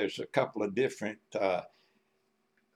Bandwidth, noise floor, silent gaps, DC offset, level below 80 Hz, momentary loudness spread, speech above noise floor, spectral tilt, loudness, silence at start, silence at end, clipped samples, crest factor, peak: 13.5 kHz; -76 dBFS; none; under 0.1%; -82 dBFS; 6 LU; 43 dB; -5 dB/octave; -33 LUFS; 0 s; 1.1 s; under 0.1%; 22 dB; -12 dBFS